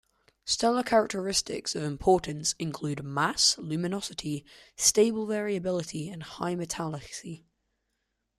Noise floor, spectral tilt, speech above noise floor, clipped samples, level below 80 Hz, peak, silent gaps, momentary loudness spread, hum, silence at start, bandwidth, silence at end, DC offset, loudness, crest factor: -80 dBFS; -3 dB/octave; 51 dB; under 0.1%; -58 dBFS; -8 dBFS; none; 15 LU; none; 0.45 s; 15 kHz; 1 s; under 0.1%; -28 LUFS; 20 dB